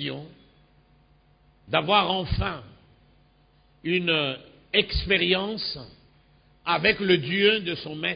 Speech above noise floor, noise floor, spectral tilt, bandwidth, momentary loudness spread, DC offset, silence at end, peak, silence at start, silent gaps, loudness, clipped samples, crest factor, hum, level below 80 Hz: 36 dB; -60 dBFS; -9 dB/octave; 5.2 kHz; 14 LU; under 0.1%; 0 s; -4 dBFS; 0 s; none; -24 LUFS; under 0.1%; 22 dB; none; -42 dBFS